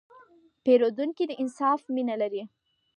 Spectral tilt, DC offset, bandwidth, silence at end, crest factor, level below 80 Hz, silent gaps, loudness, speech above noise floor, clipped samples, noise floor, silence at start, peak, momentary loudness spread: -5.5 dB/octave; under 0.1%; 9.8 kHz; 0.5 s; 18 dB; -82 dBFS; none; -27 LUFS; 31 dB; under 0.1%; -57 dBFS; 0.65 s; -10 dBFS; 9 LU